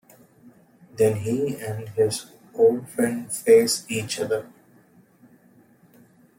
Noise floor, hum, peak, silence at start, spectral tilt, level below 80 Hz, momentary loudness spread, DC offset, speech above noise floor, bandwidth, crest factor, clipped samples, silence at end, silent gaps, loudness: -56 dBFS; none; -6 dBFS; 0.95 s; -4.5 dB/octave; -66 dBFS; 13 LU; under 0.1%; 34 dB; 16.5 kHz; 20 dB; under 0.1%; 1.9 s; none; -23 LUFS